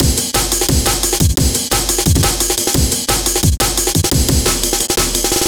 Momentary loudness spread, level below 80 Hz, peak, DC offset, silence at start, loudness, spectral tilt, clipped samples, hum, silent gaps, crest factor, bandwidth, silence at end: 1 LU; -22 dBFS; 0 dBFS; under 0.1%; 0 s; -13 LUFS; -3 dB/octave; under 0.1%; none; none; 14 dB; over 20 kHz; 0 s